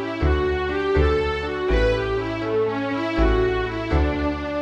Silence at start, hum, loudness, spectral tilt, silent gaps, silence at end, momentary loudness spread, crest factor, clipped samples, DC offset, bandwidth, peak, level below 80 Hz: 0 s; none; -22 LUFS; -7.5 dB/octave; none; 0 s; 5 LU; 16 dB; under 0.1%; under 0.1%; 8 kHz; -6 dBFS; -26 dBFS